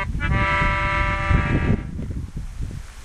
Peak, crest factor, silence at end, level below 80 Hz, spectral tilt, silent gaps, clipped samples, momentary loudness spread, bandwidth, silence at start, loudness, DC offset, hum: -4 dBFS; 18 dB; 0 s; -26 dBFS; -6.5 dB/octave; none; under 0.1%; 14 LU; 11 kHz; 0 s; -22 LUFS; under 0.1%; none